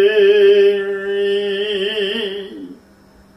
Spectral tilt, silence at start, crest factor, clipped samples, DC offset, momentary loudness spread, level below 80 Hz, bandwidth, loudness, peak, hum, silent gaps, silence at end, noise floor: -5 dB/octave; 0 s; 14 dB; under 0.1%; under 0.1%; 16 LU; -58 dBFS; 6 kHz; -15 LUFS; -2 dBFS; none; none; 0.65 s; -47 dBFS